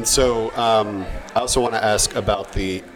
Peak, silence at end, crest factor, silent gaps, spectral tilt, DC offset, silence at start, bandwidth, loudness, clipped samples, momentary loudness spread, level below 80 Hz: -4 dBFS; 0 s; 16 dB; none; -3 dB/octave; under 0.1%; 0 s; over 20 kHz; -20 LUFS; under 0.1%; 8 LU; -34 dBFS